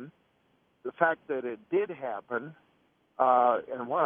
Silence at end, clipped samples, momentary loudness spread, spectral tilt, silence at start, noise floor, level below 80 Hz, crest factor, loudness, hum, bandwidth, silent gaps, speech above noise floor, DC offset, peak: 0 s; under 0.1%; 19 LU; -9 dB/octave; 0 s; -70 dBFS; -80 dBFS; 22 dB; -29 LUFS; none; 3.6 kHz; none; 41 dB; under 0.1%; -8 dBFS